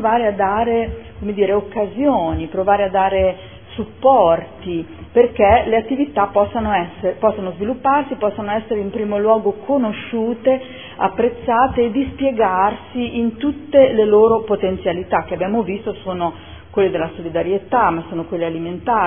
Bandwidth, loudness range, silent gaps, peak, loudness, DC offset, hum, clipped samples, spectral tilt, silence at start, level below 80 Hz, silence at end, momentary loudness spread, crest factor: 3.6 kHz; 4 LU; none; 0 dBFS; -18 LUFS; 0.4%; none; under 0.1%; -10.5 dB/octave; 0 s; -40 dBFS; 0 s; 11 LU; 18 dB